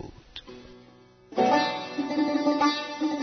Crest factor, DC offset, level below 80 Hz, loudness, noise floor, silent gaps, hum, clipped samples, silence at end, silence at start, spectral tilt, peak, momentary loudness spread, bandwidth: 18 dB; under 0.1%; -60 dBFS; -26 LUFS; -54 dBFS; none; none; under 0.1%; 0 s; 0 s; -4.5 dB/octave; -10 dBFS; 20 LU; 6.6 kHz